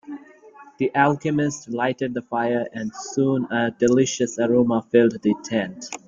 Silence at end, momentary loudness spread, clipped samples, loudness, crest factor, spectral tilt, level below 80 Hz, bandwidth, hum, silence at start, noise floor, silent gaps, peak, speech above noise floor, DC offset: 0.1 s; 9 LU; under 0.1%; -22 LUFS; 18 dB; -5.5 dB/octave; -62 dBFS; 7.6 kHz; none; 0.05 s; -47 dBFS; none; -4 dBFS; 26 dB; under 0.1%